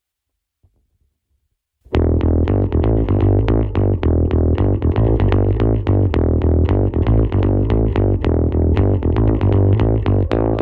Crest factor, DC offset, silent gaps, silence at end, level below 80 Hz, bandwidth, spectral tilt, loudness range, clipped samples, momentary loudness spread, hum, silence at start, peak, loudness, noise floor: 16 dB; under 0.1%; none; 0 s; -22 dBFS; 4.5 kHz; -11 dB/octave; 2 LU; under 0.1%; 2 LU; none; 1.9 s; 0 dBFS; -16 LUFS; -78 dBFS